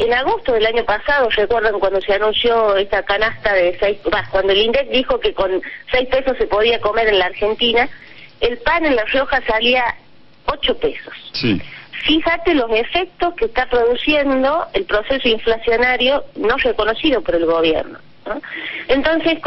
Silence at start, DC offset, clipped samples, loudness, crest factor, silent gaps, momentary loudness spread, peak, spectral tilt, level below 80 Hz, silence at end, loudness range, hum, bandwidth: 0 s; under 0.1%; under 0.1%; -17 LUFS; 14 dB; none; 7 LU; -2 dBFS; -6.5 dB/octave; -36 dBFS; 0 s; 2 LU; none; 6 kHz